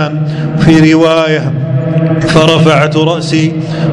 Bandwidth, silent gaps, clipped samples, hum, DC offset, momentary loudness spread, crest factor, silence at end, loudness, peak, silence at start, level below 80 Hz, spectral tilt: 11 kHz; none; 3%; none; under 0.1%; 8 LU; 8 dB; 0 s; -9 LUFS; 0 dBFS; 0 s; -38 dBFS; -6.5 dB/octave